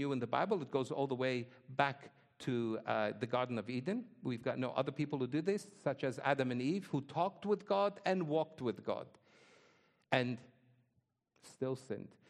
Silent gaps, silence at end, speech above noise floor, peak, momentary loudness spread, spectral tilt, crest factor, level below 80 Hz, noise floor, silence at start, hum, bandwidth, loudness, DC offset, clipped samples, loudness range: none; 0.2 s; 43 dB; -14 dBFS; 8 LU; -6.5 dB/octave; 24 dB; -82 dBFS; -81 dBFS; 0 s; none; 12.5 kHz; -38 LUFS; under 0.1%; under 0.1%; 5 LU